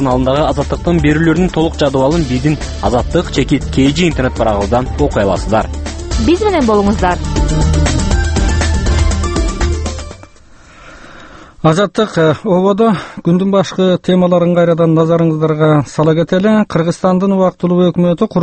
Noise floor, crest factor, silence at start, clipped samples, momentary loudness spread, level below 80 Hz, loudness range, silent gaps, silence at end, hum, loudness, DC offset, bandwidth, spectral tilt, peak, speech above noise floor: -40 dBFS; 12 dB; 0 s; under 0.1%; 5 LU; -22 dBFS; 5 LU; none; 0 s; none; -13 LUFS; under 0.1%; 8.8 kHz; -6.5 dB/octave; 0 dBFS; 28 dB